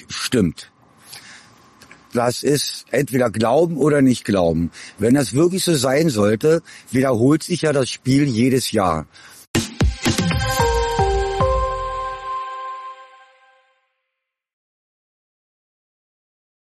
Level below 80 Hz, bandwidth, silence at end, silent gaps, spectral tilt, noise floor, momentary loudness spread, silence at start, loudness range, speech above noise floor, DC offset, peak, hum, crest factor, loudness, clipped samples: -34 dBFS; 13.5 kHz; 3.6 s; 9.47-9.54 s; -5.5 dB/octave; -79 dBFS; 11 LU; 0.1 s; 8 LU; 62 dB; under 0.1%; -6 dBFS; none; 14 dB; -19 LUFS; under 0.1%